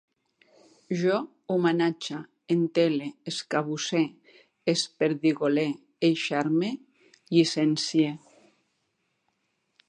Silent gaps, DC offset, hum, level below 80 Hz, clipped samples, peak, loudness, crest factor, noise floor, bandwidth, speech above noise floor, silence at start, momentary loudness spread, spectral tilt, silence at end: none; under 0.1%; none; -80 dBFS; under 0.1%; -8 dBFS; -27 LUFS; 20 dB; -76 dBFS; 10 kHz; 50 dB; 0.9 s; 10 LU; -5 dB/octave; 1.7 s